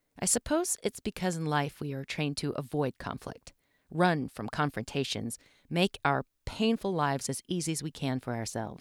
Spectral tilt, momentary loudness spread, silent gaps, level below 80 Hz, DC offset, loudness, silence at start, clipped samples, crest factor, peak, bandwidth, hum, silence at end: -4.5 dB/octave; 12 LU; none; -56 dBFS; under 0.1%; -32 LUFS; 0.15 s; under 0.1%; 22 dB; -10 dBFS; 18 kHz; none; 0.05 s